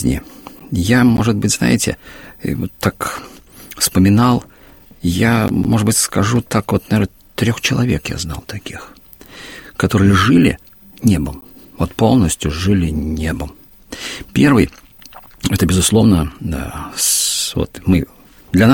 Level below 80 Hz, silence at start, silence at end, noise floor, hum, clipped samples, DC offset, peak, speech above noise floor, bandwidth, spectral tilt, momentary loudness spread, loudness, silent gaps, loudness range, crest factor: -34 dBFS; 0 s; 0 s; -43 dBFS; none; under 0.1%; under 0.1%; 0 dBFS; 28 dB; 17 kHz; -5 dB/octave; 17 LU; -16 LUFS; none; 3 LU; 16 dB